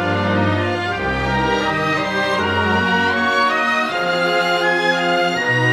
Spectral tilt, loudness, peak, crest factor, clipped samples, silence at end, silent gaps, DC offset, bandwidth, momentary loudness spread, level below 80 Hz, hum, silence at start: -5 dB/octave; -17 LUFS; -4 dBFS; 12 dB; under 0.1%; 0 s; none; under 0.1%; 15 kHz; 3 LU; -40 dBFS; none; 0 s